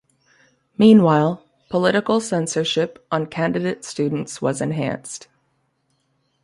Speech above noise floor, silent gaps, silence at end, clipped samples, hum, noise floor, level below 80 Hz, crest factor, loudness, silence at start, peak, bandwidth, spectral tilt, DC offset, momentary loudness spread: 49 dB; none; 1.25 s; under 0.1%; none; -68 dBFS; -60 dBFS; 18 dB; -19 LUFS; 0.8 s; -2 dBFS; 11.5 kHz; -5.5 dB/octave; under 0.1%; 14 LU